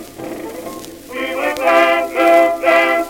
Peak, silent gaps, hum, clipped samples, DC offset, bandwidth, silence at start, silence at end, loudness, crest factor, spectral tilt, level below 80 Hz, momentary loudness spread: 0 dBFS; none; none; under 0.1%; under 0.1%; 17 kHz; 0 s; 0 s; -13 LUFS; 16 dB; -3 dB/octave; -52 dBFS; 18 LU